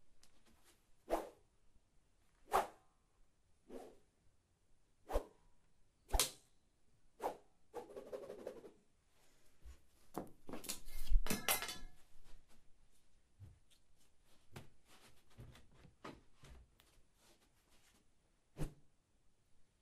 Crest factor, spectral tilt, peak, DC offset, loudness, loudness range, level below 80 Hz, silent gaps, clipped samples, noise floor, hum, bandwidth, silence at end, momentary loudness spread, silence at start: 30 dB; -2.5 dB/octave; -14 dBFS; under 0.1%; -44 LUFS; 19 LU; -50 dBFS; none; under 0.1%; -73 dBFS; none; 15.5 kHz; 0.2 s; 26 LU; 0 s